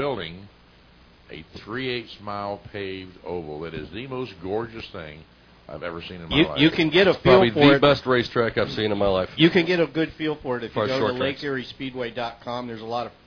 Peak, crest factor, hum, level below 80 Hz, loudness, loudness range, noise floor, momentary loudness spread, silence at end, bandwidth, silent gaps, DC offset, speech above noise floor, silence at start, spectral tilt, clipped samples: -4 dBFS; 20 dB; none; -48 dBFS; -22 LUFS; 15 LU; -53 dBFS; 19 LU; 0.15 s; 5.4 kHz; none; under 0.1%; 30 dB; 0 s; -7 dB/octave; under 0.1%